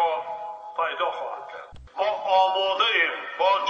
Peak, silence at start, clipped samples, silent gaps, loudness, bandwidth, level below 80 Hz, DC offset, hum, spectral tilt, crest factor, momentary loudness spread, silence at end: -8 dBFS; 0 s; under 0.1%; none; -24 LUFS; 7.6 kHz; -58 dBFS; under 0.1%; none; -2 dB/octave; 18 dB; 16 LU; 0 s